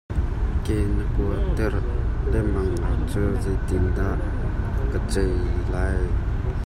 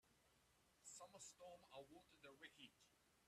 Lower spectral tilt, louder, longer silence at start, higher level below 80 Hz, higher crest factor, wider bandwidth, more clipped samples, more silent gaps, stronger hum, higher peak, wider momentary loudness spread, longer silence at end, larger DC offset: first, -7.5 dB/octave vs -2 dB/octave; first, -25 LUFS vs -63 LUFS; about the same, 0.1 s vs 0.05 s; first, -24 dBFS vs -90 dBFS; second, 12 dB vs 18 dB; second, 11.5 kHz vs 13.5 kHz; neither; neither; neither; first, -10 dBFS vs -48 dBFS; second, 3 LU vs 6 LU; about the same, 0 s vs 0 s; neither